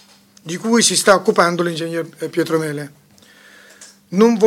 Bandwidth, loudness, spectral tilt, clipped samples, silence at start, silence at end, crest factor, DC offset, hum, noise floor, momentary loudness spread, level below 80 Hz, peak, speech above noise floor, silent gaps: 16.5 kHz; -16 LUFS; -3.5 dB/octave; under 0.1%; 0.45 s; 0 s; 18 dB; under 0.1%; none; -48 dBFS; 17 LU; -64 dBFS; 0 dBFS; 32 dB; none